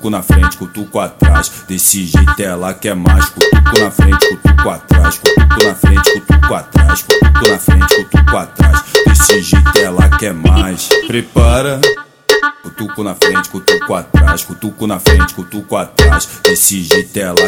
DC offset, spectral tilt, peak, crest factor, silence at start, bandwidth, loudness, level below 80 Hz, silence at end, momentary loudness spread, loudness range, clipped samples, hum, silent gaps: under 0.1%; -4.5 dB/octave; 0 dBFS; 10 dB; 0 s; 20 kHz; -10 LUFS; -14 dBFS; 0 s; 9 LU; 3 LU; 0.3%; none; none